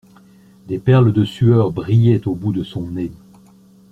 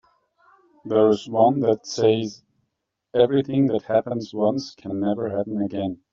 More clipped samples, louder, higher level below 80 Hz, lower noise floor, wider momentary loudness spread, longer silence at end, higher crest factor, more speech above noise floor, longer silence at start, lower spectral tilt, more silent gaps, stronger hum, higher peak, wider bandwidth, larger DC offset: neither; first, -17 LUFS vs -22 LUFS; first, -48 dBFS vs -64 dBFS; second, -47 dBFS vs -77 dBFS; first, 13 LU vs 9 LU; first, 0.75 s vs 0.2 s; about the same, 16 dB vs 18 dB; second, 32 dB vs 56 dB; second, 0.65 s vs 0.85 s; first, -9.5 dB/octave vs -6.5 dB/octave; neither; neither; about the same, -2 dBFS vs -4 dBFS; second, 4.5 kHz vs 7.6 kHz; neither